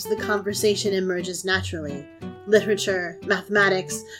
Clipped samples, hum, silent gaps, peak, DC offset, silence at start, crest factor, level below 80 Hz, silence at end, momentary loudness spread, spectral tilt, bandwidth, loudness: under 0.1%; none; none; -4 dBFS; under 0.1%; 0 s; 20 dB; -60 dBFS; 0 s; 13 LU; -3.5 dB/octave; 16.5 kHz; -23 LUFS